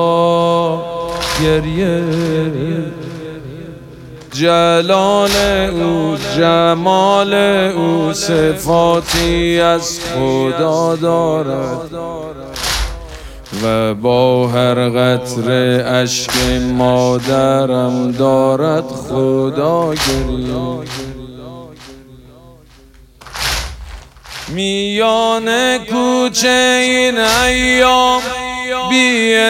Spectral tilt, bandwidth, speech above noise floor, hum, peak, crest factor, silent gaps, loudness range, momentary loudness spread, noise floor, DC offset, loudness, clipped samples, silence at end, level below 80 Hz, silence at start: -4.5 dB/octave; 16.5 kHz; 29 dB; none; 0 dBFS; 14 dB; none; 8 LU; 16 LU; -43 dBFS; under 0.1%; -14 LUFS; under 0.1%; 0 s; -34 dBFS; 0 s